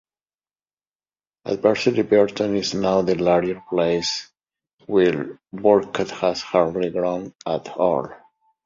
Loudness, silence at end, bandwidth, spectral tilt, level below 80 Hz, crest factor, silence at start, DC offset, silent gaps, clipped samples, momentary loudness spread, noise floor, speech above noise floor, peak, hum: -21 LUFS; 0.5 s; 7.6 kHz; -5.5 dB/octave; -56 dBFS; 20 dB; 1.45 s; under 0.1%; 4.73-4.78 s, 7.35-7.39 s; under 0.1%; 10 LU; under -90 dBFS; over 70 dB; -2 dBFS; none